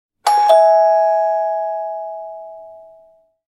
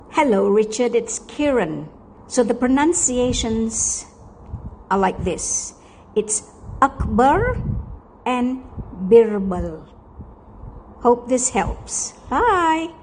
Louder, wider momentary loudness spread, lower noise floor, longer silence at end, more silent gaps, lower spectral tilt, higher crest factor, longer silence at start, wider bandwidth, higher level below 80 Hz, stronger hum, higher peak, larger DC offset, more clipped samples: first, -14 LUFS vs -19 LUFS; first, 21 LU vs 15 LU; first, -51 dBFS vs -41 dBFS; first, 0.7 s vs 0.05 s; neither; second, 0.5 dB/octave vs -4 dB/octave; about the same, 16 dB vs 18 dB; first, 0.25 s vs 0.1 s; first, 13 kHz vs 10 kHz; second, -74 dBFS vs -36 dBFS; neither; about the same, 0 dBFS vs -2 dBFS; neither; neither